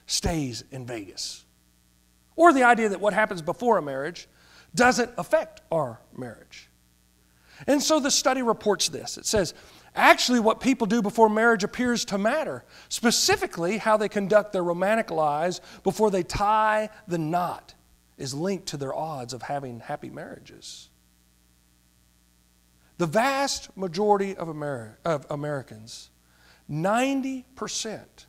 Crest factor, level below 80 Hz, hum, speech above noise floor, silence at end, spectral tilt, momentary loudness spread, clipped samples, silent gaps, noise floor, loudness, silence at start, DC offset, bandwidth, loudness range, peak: 26 dB; -52 dBFS; 60 Hz at -60 dBFS; 37 dB; 0.25 s; -3.5 dB/octave; 16 LU; under 0.1%; none; -62 dBFS; -24 LUFS; 0.1 s; under 0.1%; 16 kHz; 11 LU; 0 dBFS